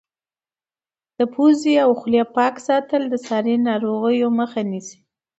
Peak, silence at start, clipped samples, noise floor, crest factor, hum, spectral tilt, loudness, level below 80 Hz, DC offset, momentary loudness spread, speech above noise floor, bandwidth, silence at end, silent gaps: -4 dBFS; 1.2 s; under 0.1%; under -90 dBFS; 16 dB; none; -5.5 dB/octave; -19 LUFS; -68 dBFS; under 0.1%; 8 LU; over 72 dB; 8.2 kHz; 0.45 s; none